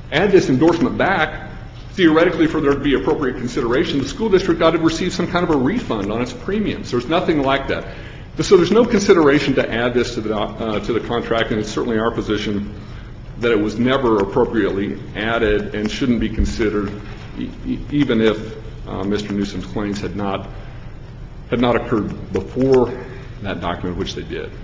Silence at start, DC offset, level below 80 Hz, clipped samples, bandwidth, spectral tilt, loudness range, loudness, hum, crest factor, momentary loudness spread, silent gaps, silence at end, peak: 0 s; under 0.1%; -34 dBFS; under 0.1%; 7.8 kHz; -6 dB/octave; 6 LU; -18 LUFS; none; 18 dB; 16 LU; none; 0 s; 0 dBFS